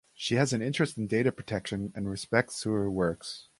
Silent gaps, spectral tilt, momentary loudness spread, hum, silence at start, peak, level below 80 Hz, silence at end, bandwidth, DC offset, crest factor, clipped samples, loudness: none; -5 dB/octave; 8 LU; none; 0.2 s; -8 dBFS; -56 dBFS; 0.2 s; 11.5 kHz; under 0.1%; 22 dB; under 0.1%; -30 LUFS